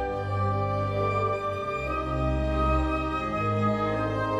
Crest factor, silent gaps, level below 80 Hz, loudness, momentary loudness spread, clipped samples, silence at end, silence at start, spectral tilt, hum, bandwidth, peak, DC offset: 14 dB; none; -36 dBFS; -27 LUFS; 4 LU; under 0.1%; 0 s; 0 s; -8 dB/octave; none; 9.8 kHz; -12 dBFS; under 0.1%